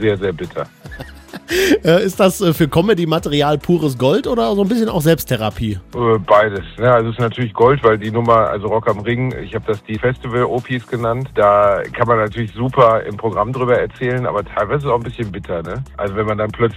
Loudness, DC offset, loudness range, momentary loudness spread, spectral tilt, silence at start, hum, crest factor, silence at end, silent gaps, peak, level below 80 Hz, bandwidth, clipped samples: -16 LUFS; under 0.1%; 3 LU; 11 LU; -6 dB/octave; 0 s; none; 16 dB; 0 s; none; 0 dBFS; -40 dBFS; 16 kHz; under 0.1%